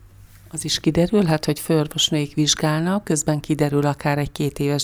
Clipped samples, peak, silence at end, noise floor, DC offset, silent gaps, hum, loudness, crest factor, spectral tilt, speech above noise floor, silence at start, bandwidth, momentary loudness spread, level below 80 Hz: under 0.1%; -4 dBFS; 0 s; -45 dBFS; under 0.1%; none; none; -20 LUFS; 16 dB; -4.5 dB/octave; 25 dB; 0.05 s; over 20 kHz; 5 LU; -46 dBFS